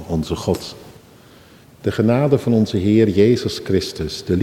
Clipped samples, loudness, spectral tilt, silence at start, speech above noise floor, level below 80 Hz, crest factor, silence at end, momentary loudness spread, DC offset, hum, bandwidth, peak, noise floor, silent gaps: under 0.1%; -18 LUFS; -7 dB/octave; 0 s; 29 dB; -42 dBFS; 16 dB; 0 s; 10 LU; under 0.1%; none; 16 kHz; -2 dBFS; -46 dBFS; none